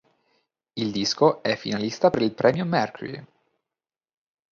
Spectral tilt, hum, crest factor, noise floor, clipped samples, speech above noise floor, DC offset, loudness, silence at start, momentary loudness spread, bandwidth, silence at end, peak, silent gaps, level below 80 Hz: -5 dB/octave; none; 22 dB; under -90 dBFS; under 0.1%; over 67 dB; under 0.1%; -23 LUFS; 0.75 s; 16 LU; 7.4 kHz; 1.25 s; -4 dBFS; none; -62 dBFS